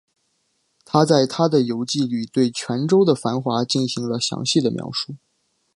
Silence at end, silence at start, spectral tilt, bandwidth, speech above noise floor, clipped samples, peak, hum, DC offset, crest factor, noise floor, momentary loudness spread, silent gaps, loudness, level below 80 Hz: 0.6 s; 0.95 s; -5.5 dB/octave; 11.5 kHz; 49 dB; under 0.1%; -2 dBFS; none; under 0.1%; 20 dB; -69 dBFS; 7 LU; none; -20 LUFS; -66 dBFS